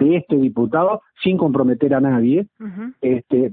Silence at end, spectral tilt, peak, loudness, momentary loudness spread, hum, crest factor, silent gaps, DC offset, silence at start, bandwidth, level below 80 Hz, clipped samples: 0 s; -12.5 dB/octave; -2 dBFS; -18 LUFS; 8 LU; none; 14 dB; none; under 0.1%; 0 s; 4.1 kHz; -58 dBFS; under 0.1%